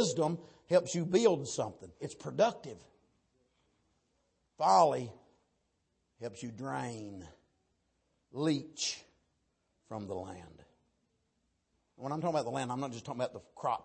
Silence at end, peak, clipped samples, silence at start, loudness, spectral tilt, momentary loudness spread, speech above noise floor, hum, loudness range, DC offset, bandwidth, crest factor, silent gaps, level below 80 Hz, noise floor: 0 s; -14 dBFS; under 0.1%; 0 s; -33 LUFS; -5 dB/octave; 19 LU; 46 dB; none; 10 LU; under 0.1%; 8.8 kHz; 22 dB; none; -74 dBFS; -79 dBFS